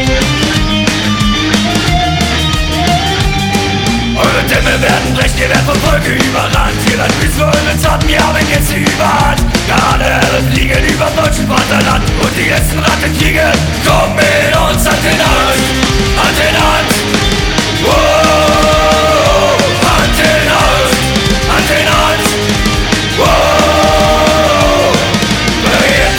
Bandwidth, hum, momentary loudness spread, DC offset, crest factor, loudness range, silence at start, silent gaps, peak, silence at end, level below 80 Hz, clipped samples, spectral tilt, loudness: 19.5 kHz; none; 3 LU; under 0.1%; 10 dB; 2 LU; 0 s; none; 0 dBFS; 0 s; -18 dBFS; under 0.1%; -4 dB/octave; -9 LUFS